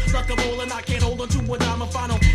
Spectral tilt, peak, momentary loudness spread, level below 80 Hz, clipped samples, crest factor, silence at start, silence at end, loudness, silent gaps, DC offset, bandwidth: -5 dB/octave; -4 dBFS; 3 LU; -26 dBFS; under 0.1%; 16 dB; 0 s; 0 s; -23 LUFS; none; under 0.1%; 13.5 kHz